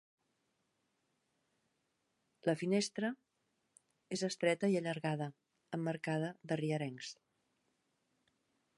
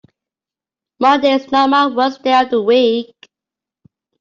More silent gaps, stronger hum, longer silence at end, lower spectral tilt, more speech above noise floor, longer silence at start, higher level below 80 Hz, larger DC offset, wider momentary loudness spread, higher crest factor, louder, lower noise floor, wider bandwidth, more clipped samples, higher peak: neither; neither; first, 1.65 s vs 1.15 s; about the same, -5.5 dB/octave vs -4.5 dB/octave; second, 46 dB vs 76 dB; first, 2.45 s vs 1 s; second, -86 dBFS vs -62 dBFS; neither; first, 12 LU vs 5 LU; first, 22 dB vs 14 dB; second, -38 LUFS vs -14 LUFS; second, -83 dBFS vs -89 dBFS; first, 11.5 kHz vs 7.4 kHz; neither; second, -18 dBFS vs -2 dBFS